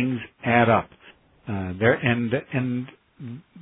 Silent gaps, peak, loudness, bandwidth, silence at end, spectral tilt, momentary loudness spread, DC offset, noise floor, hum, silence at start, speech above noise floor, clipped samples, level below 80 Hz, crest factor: none; -4 dBFS; -23 LUFS; 3.9 kHz; 0 s; -11 dB/octave; 21 LU; under 0.1%; -53 dBFS; none; 0 s; 30 dB; under 0.1%; -58 dBFS; 20 dB